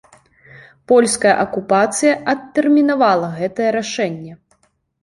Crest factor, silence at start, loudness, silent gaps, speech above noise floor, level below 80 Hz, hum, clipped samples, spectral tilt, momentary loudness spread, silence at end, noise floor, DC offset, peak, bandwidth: 16 dB; 0.9 s; -16 LUFS; none; 45 dB; -60 dBFS; none; under 0.1%; -4 dB/octave; 9 LU; 0.65 s; -61 dBFS; under 0.1%; -2 dBFS; 11.5 kHz